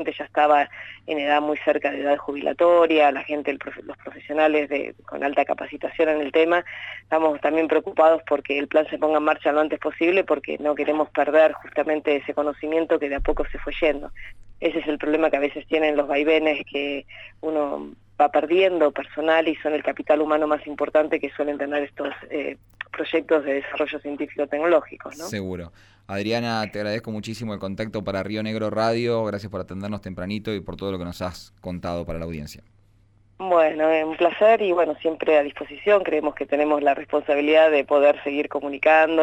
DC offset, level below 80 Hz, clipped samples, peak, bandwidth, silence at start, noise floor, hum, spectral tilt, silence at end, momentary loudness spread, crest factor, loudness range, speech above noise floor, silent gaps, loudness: under 0.1%; -46 dBFS; under 0.1%; -6 dBFS; 11.5 kHz; 0 s; -57 dBFS; none; -6 dB/octave; 0 s; 14 LU; 16 dB; 6 LU; 35 dB; none; -22 LUFS